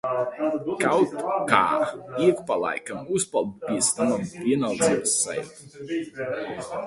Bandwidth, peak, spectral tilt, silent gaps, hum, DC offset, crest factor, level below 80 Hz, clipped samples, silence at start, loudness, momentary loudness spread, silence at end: 11.5 kHz; 0 dBFS; -3.5 dB/octave; none; none; under 0.1%; 24 dB; -62 dBFS; under 0.1%; 0.05 s; -24 LUFS; 10 LU; 0 s